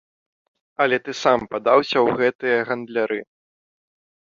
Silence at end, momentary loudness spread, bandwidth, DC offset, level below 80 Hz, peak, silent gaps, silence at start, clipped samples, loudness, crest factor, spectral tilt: 1.1 s; 8 LU; 7.6 kHz; under 0.1%; -62 dBFS; -2 dBFS; 2.35-2.39 s; 0.8 s; under 0.1%; -20 LUFS; 20 dB; -4.5 dB/octave